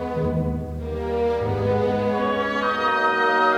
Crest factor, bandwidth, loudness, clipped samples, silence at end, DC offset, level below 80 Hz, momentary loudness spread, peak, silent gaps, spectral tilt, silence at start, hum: 14 dB; 11 kHz; -22 LUFS; under 0.1%; 0 s; under 0.1%; -42 dBFS; 8 LU; -8 dBFS; none; -7 dB/octave; 0 s; none